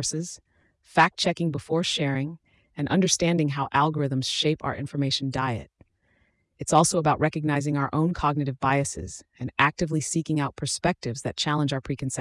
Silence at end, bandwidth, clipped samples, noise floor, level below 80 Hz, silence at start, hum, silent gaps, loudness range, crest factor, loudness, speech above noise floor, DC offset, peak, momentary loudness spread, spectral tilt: 0 s; 12 kHz; under 0.1%; -67 dBFS; -52 dBFS; 0 s; none; none; 2 LU; 20 dB; -25 LUFS; 42 dB; under 0.1%; -6 dBFS; 10 LU; -4.5 dB/octave